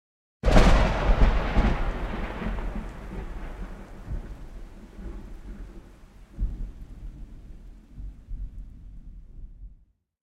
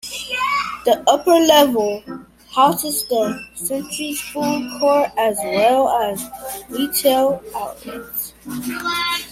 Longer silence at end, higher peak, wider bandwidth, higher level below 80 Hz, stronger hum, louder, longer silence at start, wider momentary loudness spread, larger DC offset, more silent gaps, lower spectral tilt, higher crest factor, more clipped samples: first, 0.55 s vs 0 s; about the same, -2 dBFS vs 0 dBFS; second, 9.6 kHz vs 16.5 kHz; first, -28 dBFS vs -54 dBFS; neither; second, -27 LUFS vs -18 LUFS; first, 0.45 s vs 0.05 s; first, 25 LU vs 14 LU; neither; neither; first, -6.5 dB/octave vs -3 dB/octave; first, 24 dB vs 18 dB; neither